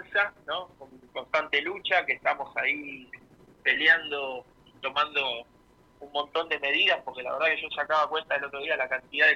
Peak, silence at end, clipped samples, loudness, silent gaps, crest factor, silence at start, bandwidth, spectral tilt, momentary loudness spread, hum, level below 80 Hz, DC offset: -8 dBFS; 0 s; under 0.1%; -27 LUFS; none; 20 dB; 0 s; 11 kHz; -3 dB/octave; 14 LU; none; -68 dBFS; under 0.1%